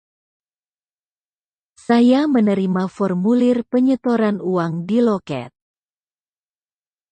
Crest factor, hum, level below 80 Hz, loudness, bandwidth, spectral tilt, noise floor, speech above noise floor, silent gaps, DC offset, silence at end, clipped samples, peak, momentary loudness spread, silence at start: 16 dB; 50 Hz at -45 dBFS; -64 dBFS; -18 LUFS; 8.8 kHz; -8 dB/octave; under -90 dBFS; over 73 dB; none; under 0.1%; 1.65 s; under 0.1%; -4 dBFS; 8 LU; 1.9 s